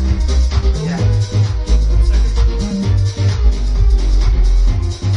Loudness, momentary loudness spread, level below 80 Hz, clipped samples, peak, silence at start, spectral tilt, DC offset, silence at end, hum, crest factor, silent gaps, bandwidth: -16 LUFS; 2 LU; -14 dBFS; under 0.1%; -2 dBFS; 0 s; -6.5 dB/octave; under 0.1%; 0 s; none; 10 dB; none; 8 kHz